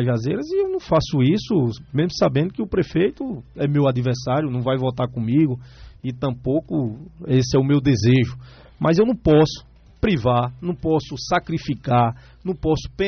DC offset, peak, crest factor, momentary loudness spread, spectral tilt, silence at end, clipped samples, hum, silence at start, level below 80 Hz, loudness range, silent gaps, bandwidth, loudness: under 0.1%; -8 dBFS; 14 dB; 9 LU; -6.5 dB/octave; 0 s; under 0.1%; none; 0 s; -42 dBFS; 3 LU; none; 6.6 kHz; -21 LUFS